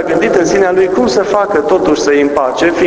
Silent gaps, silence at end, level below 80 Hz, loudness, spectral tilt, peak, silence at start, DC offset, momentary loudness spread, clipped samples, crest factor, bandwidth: none; 0 s; -40 dBFS; -11 LUFS; -4.5 dB/octave; 0 dBFS; 0 s; under 0.1%; 2 LU; 0.1%; 10 dB; 8 kHz